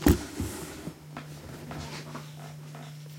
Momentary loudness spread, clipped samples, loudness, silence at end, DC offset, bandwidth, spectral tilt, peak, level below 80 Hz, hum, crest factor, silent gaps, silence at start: 12 LU; under 0.1%; -36 LUFS; 0 s; under 0.1%; 16.5 kHz; -5.5 dB/octave; -6 dBFS; -42 dBFS; none; 26 dB; none; 0 s